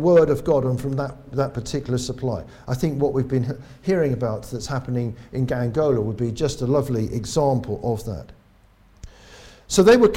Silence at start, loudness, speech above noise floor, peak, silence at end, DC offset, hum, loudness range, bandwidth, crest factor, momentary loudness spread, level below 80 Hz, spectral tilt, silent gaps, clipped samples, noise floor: 0 s; -23 LUFS; 33 dB; -4 dBFS; 0 s; under 0.1%; none; 3 LU; 16 kHz; 18 dB; 11 LU; -44 dBFS; -6.5 dB/octave; none; under 0.1%; -54 dBFS